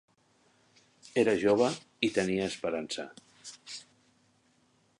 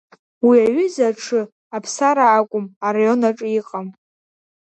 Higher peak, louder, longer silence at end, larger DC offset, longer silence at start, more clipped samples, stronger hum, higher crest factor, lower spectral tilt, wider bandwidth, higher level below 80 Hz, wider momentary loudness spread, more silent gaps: second, -12 dBFS vs -4 dBFS; second, -30 LUFS vs -18 LUFS; first, 1.15 s vs 0.8 s; neither; first, 1.15 s vs 0.45 s; neither; neither; first, 22 dB vs 16 dB; about the same, -4.5 dB/octave vs -5 dB/octave; first, 11.5 kHz vs 8.8 kHz; about the same, -68 dBFS vs -68 dBFS; first, 20 LU vs 15 LU; second, none vs 1.52-1.71 s, 2.76-2.81 s